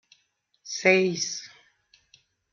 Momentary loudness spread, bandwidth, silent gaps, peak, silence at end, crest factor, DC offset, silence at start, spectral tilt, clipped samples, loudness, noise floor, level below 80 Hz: 16 LU; 7.4 kHz; none; -4 dBFS; 1.05 s; 24 dB; under 0.1%; 0.65 s; -3.5 dB/octave; under 0.1%; -24 LUFS; -71 dBFS; -76 dBFS